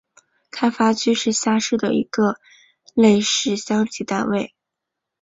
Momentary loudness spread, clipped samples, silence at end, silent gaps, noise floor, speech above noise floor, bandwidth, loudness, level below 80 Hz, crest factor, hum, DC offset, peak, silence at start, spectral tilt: 10 LU; under 0.1%; 0.75 s; none; -82 dBFS; 64 dB; 8 kHz; -19 LUFS; -60 dBFS; 18 dB; none; under 0.1%; -4 dBFS; 0.55 s; -4 dB/octave